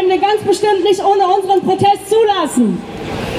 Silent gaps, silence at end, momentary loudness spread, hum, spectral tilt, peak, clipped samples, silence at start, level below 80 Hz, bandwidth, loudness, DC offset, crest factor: none; 0 s; 5 LU; none; -5 dB/octave; -2 dBFS; under 0.1%; 0 s; -44 dBFS; 15.5 kHz; -13 LUFS; under 0.1%; 12 dB